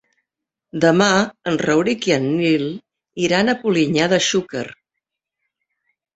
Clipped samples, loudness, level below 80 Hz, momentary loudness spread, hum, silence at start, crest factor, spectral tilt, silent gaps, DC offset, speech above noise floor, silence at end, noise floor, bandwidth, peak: under 0.1%; -18 LUFS; -58 dBFS; 14 LU; none; 0.75 s; 18 dB; -4.5 dB/octave; none; under 0.1%; 65 dB; 1.45 s; -83 dBFS; 8.2 kHz; -2 dBFS